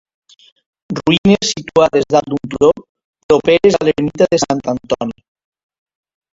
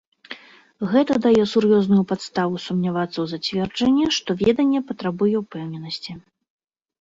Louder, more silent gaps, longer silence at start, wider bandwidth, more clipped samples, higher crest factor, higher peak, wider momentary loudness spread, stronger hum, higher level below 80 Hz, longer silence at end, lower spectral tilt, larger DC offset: first, -14 LUFS vs -21 LUFS; first, 1.18-1.24 s, 2.89-2.95 s, 3.05-3.13 s, 3.23-3.29 s vs none; first, 0.9 s vs 0.3 s; about the same, 7.8 kHz vs 7.8 kHz; neither; about the same, 16 dB vs 16 dB; first, 0 dBFS vs -6 dBFS; second, 9 LU vs 14 LU; neither; first, -46 dBFS vs -56 dBFS; first, 1.2 s vs 0.85 s; about the same, -5 dB/octave vs -6 dB/octave; neither